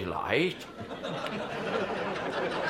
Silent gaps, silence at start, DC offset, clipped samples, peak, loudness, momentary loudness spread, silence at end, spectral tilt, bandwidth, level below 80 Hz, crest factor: none; 0 s; under 0.1%; under 0.1%; -12 dBFS; -32 LUFS; 10 LU; 0 s; -5.5 dB/octave; 16 kHz; -60 dBFS; 20 dB